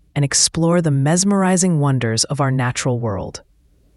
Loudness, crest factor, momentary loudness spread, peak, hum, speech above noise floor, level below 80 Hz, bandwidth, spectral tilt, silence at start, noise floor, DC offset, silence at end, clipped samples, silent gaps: -17 LUFS; 16 dB; 9 LU; 0 dBFS; none; 38 dB; -48 dBFS; 12 kHz; -4.5 dB/octave; 0.15 s; -55 dBFS; under 0.1%; 0.55 s; under 0.1%; none